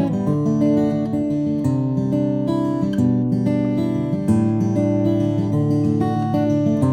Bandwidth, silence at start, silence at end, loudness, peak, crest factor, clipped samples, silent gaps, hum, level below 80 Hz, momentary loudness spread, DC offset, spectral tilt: 10 kHz; 0 s; 0 s; -19 LUFS; -6 dBFS; 12 dB; under 0.1%; none; none; -50 dBFS; 3 LU; under 0.1%; -9.5 dB/octave